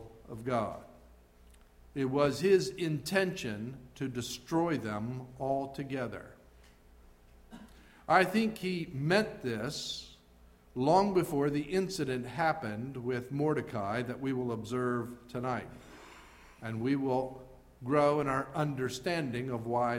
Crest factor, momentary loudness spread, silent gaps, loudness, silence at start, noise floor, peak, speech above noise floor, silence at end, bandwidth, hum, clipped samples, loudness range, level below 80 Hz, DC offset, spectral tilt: 24 dB; 17 LU; none; -33 LUFS; 0 s; -60 dBFS; -10 dBFS; 28 dB; 0 s; 16 kHz; 60 Hz at -60 dBFS; under 0.1%; 5 LU; -60 dBFS; under 0.1%; -6 dB/octave